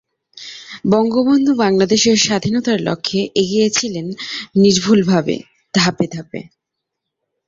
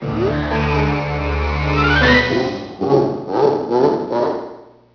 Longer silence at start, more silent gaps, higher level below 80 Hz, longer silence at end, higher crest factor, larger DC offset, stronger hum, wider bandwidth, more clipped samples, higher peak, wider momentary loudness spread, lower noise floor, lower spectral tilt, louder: first, 0.35 s vs 0 s; neither; second, -54 dBFS vs -28 dBFS; first, 1.05 s vs 0.3 s; about the same, 16 dB vs 16 dB; neither; neither; first, 7.8 kHz vs 5.4 kHz; neither; about the same, -2 dBFS vs 0 dBFS; first, 15 LU vs 9 LU; first, -79 dBFS vs -37 dBFS; second, -4.5 dB/octave vs -7 dB/octave; about the same, -15 LUFS vs -17 LUFS